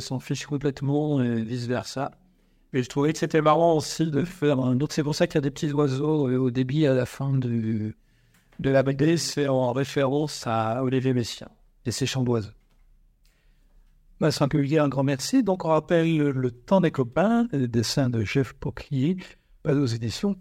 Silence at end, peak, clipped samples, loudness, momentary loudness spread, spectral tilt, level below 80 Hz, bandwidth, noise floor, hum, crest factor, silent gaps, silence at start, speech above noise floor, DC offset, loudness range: 0 s; -8 dBFS; under 0.1%; -25 LUFS; 8 LU; -6 dB/octave; -54 dBFS; 16 kHz; -61 dBFS; none; 18 dB; none; 0 s; 37 dB; under 0.1%; 4 LU